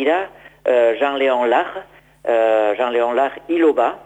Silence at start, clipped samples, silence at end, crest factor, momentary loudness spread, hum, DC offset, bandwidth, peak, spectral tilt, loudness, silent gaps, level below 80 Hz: 0 s; under 0.1%; 0.05 s; 14 dB; 11 LU; none; under 0.1%; 9 kHz; -4 dBFS; -4.5 dB/octave; -17 LUFS; none; -60 dBFS